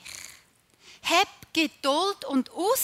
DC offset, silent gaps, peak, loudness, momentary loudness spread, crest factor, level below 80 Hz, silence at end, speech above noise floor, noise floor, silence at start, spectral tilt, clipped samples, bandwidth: under 0.1%; none; -6 dBFS; -26 LUFS; 17 LU; 22 dB; -68 dBFS; 0 s; 34 dB; -60 dBFS; 0.05 s; -1.5 dB/octave; under 0.1%; 16 kHz